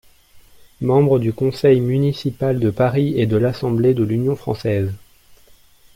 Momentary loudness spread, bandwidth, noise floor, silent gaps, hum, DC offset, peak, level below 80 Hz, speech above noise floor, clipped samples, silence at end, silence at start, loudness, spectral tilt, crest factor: 7 LU; 16 kHz; -49 dBFS; none; none; under 0.1%; -4 dBFS; -48 dBFS; 32 dB; under 0.1%; 1 s; 0.35 s; -18 LUFS; -8.5 dB/octave; 16 dB